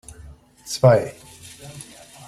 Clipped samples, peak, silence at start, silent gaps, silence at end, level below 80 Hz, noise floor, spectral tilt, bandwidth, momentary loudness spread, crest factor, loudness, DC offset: under 0.1%; -2 dBFS; 0.65 s; none; 0.45 s; -52 dBFS; -45 dBFS; -5.5 dB/octave; 14 kHz; 26 LU; 22 dB; -18 LUFS; under 0.1%